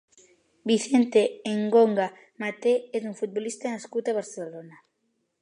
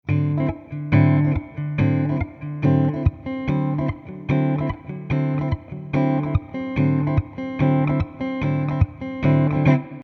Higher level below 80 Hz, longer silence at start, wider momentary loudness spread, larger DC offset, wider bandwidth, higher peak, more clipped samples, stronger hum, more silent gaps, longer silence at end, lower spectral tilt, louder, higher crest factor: second, -80 dBFS vs -38 dBFS; first, 0.65 s vs 0.05 s; first, 15 LU vs 9 LU; neither; first, 11 kHz vs 4.6 kHz; second, -8 dBFS vs -4 dBFS; neither; neither; neither; first, 0.7 s vs 0 s; second, -5 dB/octave vs -10 dB/octave; second, -26 LUFS vs -22 LUFS; about the same, 18 dB vs 16 dB